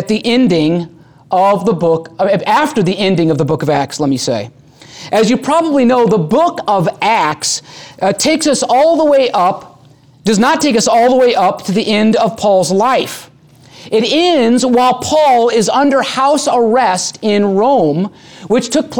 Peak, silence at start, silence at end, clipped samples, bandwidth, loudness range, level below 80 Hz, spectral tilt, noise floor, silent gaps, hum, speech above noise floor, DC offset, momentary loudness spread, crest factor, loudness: -2 dBFS; 0 s; 0 s; under 0.1%; over 20 kHz; 2 LU; -52 dBFS; -4.5 dB/octave; -43 dBFS; none; none; 32 dB; 0.3%; 7 LU; 10 dB; -12 LUFS